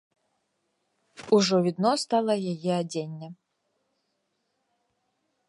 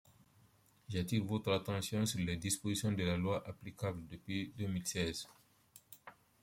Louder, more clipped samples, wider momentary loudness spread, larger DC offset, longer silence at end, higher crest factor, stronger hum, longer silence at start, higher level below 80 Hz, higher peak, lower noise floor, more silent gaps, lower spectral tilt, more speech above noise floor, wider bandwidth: first, -25 LUFS vs -38 LUFS; neither; about the same, 19 LU vs 17 LU; neither; first, 2.15 s vs 0.3 s; about the same, 20 dB vs 18 dB; neither; first, 1.2 s vs 0.9 s; second, -78 dBFS vs -64 dBFS; first, -8 dBFS vs -20 dBFS; first, -77 dBFS vs -69 dBFS; neither; about the same, -5.5 dB/octave vs -5 dB/octave; first, 52 dB vs 31 dB; second, 11.5 kHz vs 16.5 kHz